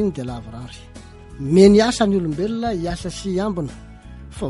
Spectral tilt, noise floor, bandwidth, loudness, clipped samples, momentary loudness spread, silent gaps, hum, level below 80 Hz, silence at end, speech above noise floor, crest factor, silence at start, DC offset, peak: -6 dB/octave; -38 dBFS; 11.5 kHz; -18 LUFS; under 0.1%; 23 LU; none; none; -40 dBFS; 0 s; 20 dB; 18 dB; 0 s; under 0.1%; -2 dBFS